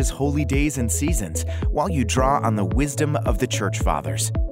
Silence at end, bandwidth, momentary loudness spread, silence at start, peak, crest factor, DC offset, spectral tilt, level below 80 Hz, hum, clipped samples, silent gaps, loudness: 0 s; 16 kHz; 4 LU; 0 s; -6 dBFS; 14 dB; under 0.1%; -5 dB/octave; -28 dBFS; none; under 0.1%; none; -22 LUFS